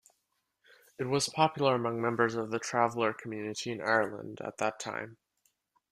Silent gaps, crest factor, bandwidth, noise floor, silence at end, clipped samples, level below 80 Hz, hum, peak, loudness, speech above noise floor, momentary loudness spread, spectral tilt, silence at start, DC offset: none; 22 dB; 14.5 kHz; -80 dBFS; 0.75 s; under 0.1%; -72 dBFS; none; -10 dBFS; -31 LUFS; 49 dB; 12 LU; -4.5 dB/octave; 1 s; under 0.1%